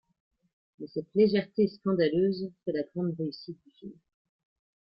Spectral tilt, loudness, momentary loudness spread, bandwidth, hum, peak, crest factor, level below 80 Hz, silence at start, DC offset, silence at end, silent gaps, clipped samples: -10.5 dB/octave; -29 LUFS; 21 LU; 5.8 kHz; none; -12 dBFS; 18 dB; -70 dBFS; 0.8 s; under 0.1%; 0.9 s; none; under 0.1%